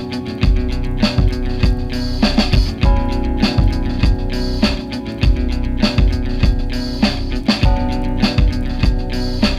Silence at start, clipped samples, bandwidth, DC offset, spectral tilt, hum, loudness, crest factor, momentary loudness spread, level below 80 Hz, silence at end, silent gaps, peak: 0 s; under 0.1%; 11 kHz; under 0.1%; -6.5 dB/octave; none; -18 LUFS; 14 dB; 6 LU; -18 dBFS; 0 s; none; -2 dBFS